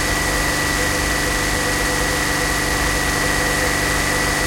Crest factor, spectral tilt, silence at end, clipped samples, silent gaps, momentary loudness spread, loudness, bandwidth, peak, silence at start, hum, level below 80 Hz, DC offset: 12 dB; -2.5 dB/octave; 0 s; under 0.1%; none; 1 LU; -18 LUFS; 16.5 kHz; -6 dBFS; 0 s; none; -28 dBFS; under 0.1%